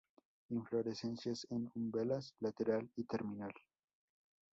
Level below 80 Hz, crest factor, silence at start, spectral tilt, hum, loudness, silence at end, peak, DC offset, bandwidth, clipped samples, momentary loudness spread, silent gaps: -78 dBFS; 18 dB; 0.5 s; -6 dB/octave; none; -42 LUFS; 0.95 s; -24 dBFS; under 0.1%; 7.6 kHz; under 0.1%; 7 LU; none